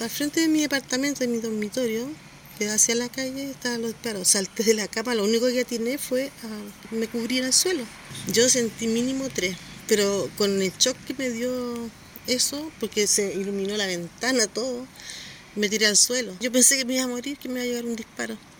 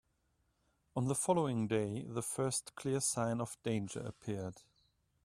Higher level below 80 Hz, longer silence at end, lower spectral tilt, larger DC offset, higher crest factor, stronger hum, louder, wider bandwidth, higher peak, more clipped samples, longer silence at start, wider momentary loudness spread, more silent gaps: first, -60 dBFS vs -70 dBFS; second, 0.05 s vs 0.65 s; second, -2 dB/octave vs -5 dB/octave; neither; about the same, 22 dB vs 20 dB; neither; first, -23 LUFS vs -37 LUFS; first, 19 kHz vs 15 kHz; first, -4 dBFS vs -18 dBFS; neither; second, 0 s vs 0.95 s; first, 14 LU vs 10 LU; neither